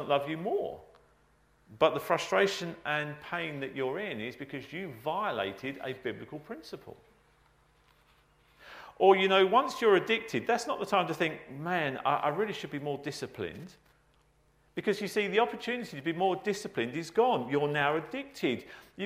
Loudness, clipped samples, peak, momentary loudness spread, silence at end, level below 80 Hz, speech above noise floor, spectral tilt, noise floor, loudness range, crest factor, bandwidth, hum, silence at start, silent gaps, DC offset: -31 LUFS; under 0.1%; -10 dBFS; 15 LU; 0 s; -70 dBFS; 36 dB; -5 dB/octave; -67 dBFS; 10 LU; 22 dB; 15.5 kHz; none; 0 s; none; under 0.1%